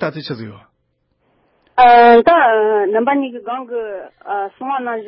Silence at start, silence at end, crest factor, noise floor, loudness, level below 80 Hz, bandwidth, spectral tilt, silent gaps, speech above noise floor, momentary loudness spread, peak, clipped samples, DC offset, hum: 0 s; 0 s; 14 dB; -66 dBFS; -13 LUFS; -54 dBFS; 5.8 kHz; -10 dB/octave; none; 52 dB; 20 LU; -2 dBFS; under 0.1%; under 0.1%; none